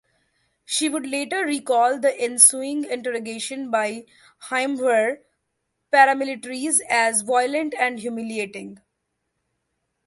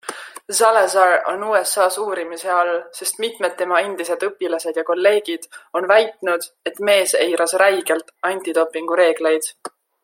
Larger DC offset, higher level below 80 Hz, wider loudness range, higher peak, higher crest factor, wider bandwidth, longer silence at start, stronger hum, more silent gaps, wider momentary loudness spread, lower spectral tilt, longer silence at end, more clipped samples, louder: neither; about the same, -74 dBFS vs -76 dBFS; about the same, 4 LU vs 3 LU; about the same, 0 dBFS vs -2 dBFS; first, 24 dB vs 18 dB; second, 12 kHz vs 16.5 kHz; first, 0.7 s vs 0.05 s; neither; neither; first, 14 LU vs 10 LU; about the same, -1 dB/octave vs -1 dB/octave; first, 1.3 s vs 0.35 s; neither; second, -21 LUFS vs -18 LUFS